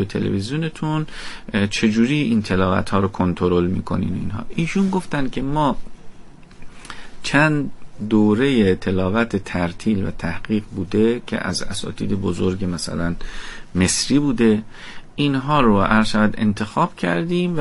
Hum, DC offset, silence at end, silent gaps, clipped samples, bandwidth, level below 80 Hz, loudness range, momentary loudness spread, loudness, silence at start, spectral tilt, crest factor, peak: none; under 0.1%; 0 s; none; under 0.1%; 11.5 kHz; -36 dBFS; 4 LU; 11 LU; -20 LUFS; 0 s; -5.5 dB/octave; 16 dB; -2 dBFS